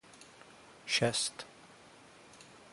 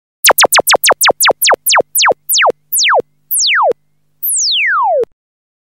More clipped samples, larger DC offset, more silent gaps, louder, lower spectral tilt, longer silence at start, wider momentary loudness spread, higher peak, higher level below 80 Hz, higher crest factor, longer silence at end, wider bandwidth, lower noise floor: neither; second, under 0.1% vs 0.1%; neither; second, -32 LUFS vs -10 LUFS; first, -2.5 dB/octave vs 1.5 dB/octave; about the same, 0.15 s vs 0.25 s; first, 26 LU vs 8 LU; second, -16 dBFS vs 0 dBFS; second, -72 dBFS vs -60 dBFS; first, 24 dB vs 12 dB; second, 0.15 s vs 0.7 s; second, 11.5 kHz vs 17 kHz; about the same, -57 dBFS vs -59 dBFS